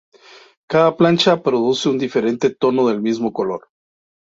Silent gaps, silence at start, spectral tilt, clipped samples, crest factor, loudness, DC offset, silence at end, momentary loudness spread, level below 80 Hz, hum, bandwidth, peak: none; 0.7 s; -5.5 dB/octave; under 0.1%; 16 dB; -17 LUFS; under 0.1%; 0.75 s; 7 LU; -60 dBFS; none; 8 kHz; -2 dBFS